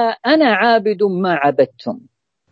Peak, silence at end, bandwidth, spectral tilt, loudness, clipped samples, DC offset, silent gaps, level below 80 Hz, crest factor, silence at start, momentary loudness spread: 0 dBFS; 0.55 s; 7.4 kHz; -7.5 dB/octave; -15 LUFS; under 0.1%; under 0.1%; none; -70 dBFS; 16 dB; 0 s; 16 LU